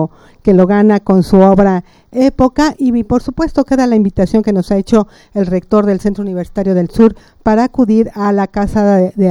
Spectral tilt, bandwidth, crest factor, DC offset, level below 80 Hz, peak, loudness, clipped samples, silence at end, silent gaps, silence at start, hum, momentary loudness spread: -8 dB/octave; 11.5 kHz; 12 dB; under 0.1%; -32 dBFS; 0 dBFS; -12 LUFS; 0.1%; 0 s; none; 0 s; none; 9 LU